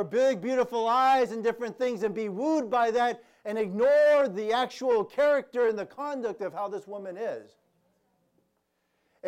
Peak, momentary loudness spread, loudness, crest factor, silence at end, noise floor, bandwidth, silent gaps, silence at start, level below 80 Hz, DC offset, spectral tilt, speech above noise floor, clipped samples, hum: -16 dBFS; 13 LU; -27 LUFS; 12 dB; 0 s; -75 dBFS; 14 kHz; none; 0 s; -72 dBFS; under 0.1%; -5 dB/octave; 49 dB; under 0.1%; none